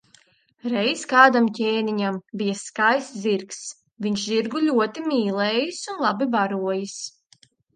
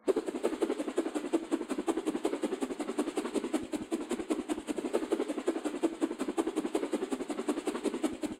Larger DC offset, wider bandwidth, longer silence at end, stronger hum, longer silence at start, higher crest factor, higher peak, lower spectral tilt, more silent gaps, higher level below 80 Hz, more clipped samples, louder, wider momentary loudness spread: neither; second, 9.8 kHz vs 15.5 kHz; first, 0.65 s vs 0 s; neither; first, 0.65 s vs 0.05 s; about the same, 22 dB vs 18 dB; first, 0 dBFS vs -16 dBFS; about the same, -4 dB/octave vs -4 dB/octave; neither; second, -72 dBFS vs -66 dBFS; neither; first, -22 LUFS vs -34 LUFS; first, 14 LU vs 3 LU